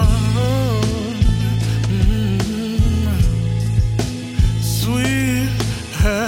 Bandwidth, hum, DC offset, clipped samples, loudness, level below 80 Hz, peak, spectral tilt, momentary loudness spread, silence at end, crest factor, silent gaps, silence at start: 16.5 kHz; none; under 0.1%; under 0.1%; -18 LUFS; -22 dBFS; -2 dBFS; -6 dB/octave; 3 LU; 0 s; 14 dB; none; 0 s